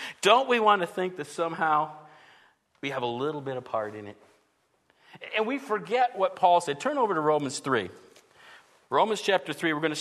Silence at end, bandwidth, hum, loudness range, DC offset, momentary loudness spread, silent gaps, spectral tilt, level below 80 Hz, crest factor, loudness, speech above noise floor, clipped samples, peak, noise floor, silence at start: 0 s; 13.5 kHz; none; 7 LU; under 0.1%; 12 LU; none; -4 dB/octave; -78 dBFS; 22 dB; -27 LUFS; 44 dB; under 0.1%; -6 dBFS; -70 dBFS; 0 s